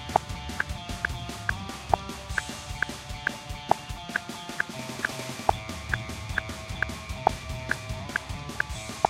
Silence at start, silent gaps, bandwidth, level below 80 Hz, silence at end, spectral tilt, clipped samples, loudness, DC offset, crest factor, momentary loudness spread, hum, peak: 0 s; none; 16 kHz; -42 dBFS; 0 s; -4 dB/octave; under 0.1%; -31 LUFS; under 0.1%; 26 dB; 5 LU; none; -6 dBFS